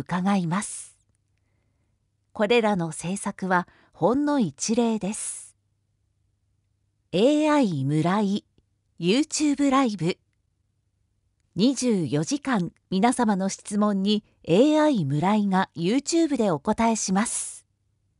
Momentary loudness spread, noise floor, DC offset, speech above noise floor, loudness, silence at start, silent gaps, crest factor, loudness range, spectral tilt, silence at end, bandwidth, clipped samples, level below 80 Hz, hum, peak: 9 LU; -71 dBFS; under 0.1%; 48 dB; -24 LUFS; 0 s; none; 18 dB; 5 LU; -5 dB/octave; 0.6 s; 11.5 kHz; under 0.1%; -62 dBFS; none; -6 dBFS